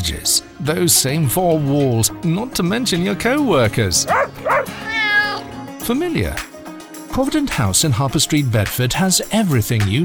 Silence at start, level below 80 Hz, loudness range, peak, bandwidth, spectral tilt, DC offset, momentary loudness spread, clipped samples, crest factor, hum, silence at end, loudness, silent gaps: 0 s; -38 dBFS; 3 LU; -4 dBFS; over 20 kHz; -4 dB/octave; under 0.1%; 8 LU; under 0.1%; 14 dB; none; 0 s; -17 LUFS; none